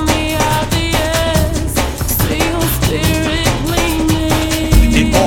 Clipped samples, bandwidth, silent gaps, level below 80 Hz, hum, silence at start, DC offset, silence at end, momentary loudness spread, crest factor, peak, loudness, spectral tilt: under 0.1%; 17.5 kHz; none; -20 dBFS; none; 0 s; under 0.1%; 0 s; 4 LU; 14 dB; 0 dBFS; -14 LUFS; -4.5 dB/octave